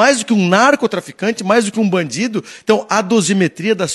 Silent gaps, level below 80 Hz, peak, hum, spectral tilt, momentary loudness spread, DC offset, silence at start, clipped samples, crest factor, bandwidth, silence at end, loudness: none; -62 dBFS; 0 dBFS; none; -4.5 dB/octave; 9 LU; under 0.1%; 0 s; under 0.1%; 14 dB; 12.5 kHz; 0 s; -15 LUFS